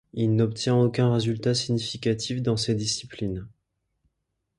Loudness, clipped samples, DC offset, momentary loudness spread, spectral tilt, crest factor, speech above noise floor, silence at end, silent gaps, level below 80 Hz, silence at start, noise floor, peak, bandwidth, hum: -25 LUFS; under 0.1%; under 0.1%; 9 LU; -5.5 dB/octave; 16 dB; 55 dB; 1.1 s; none; -54 dBFS; 0.15 s; -79 dBFS; -10 dBFS; 11.5 kHz; none